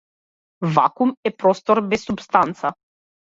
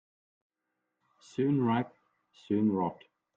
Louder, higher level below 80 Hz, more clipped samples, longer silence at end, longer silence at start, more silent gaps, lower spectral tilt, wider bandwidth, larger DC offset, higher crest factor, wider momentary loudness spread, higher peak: first, -20 LUFS vs -31 LUFS; first, -58 dBFS vs -74 dBFS; neither; about the same, 0.55 s vs 0.45 s; second, 0.6 s vs 1.4 s; first, 1.17-1.23 s vs none; second, -6.5 dB/octave vs -8.5 dB/octave; about the same, 7.8 kHz vs 8 kHz; neither; about the same, 20 dB vs 16 dB; about the same, 9 LU vs 11 LU; first, 0 dBFS vs -16 dBFS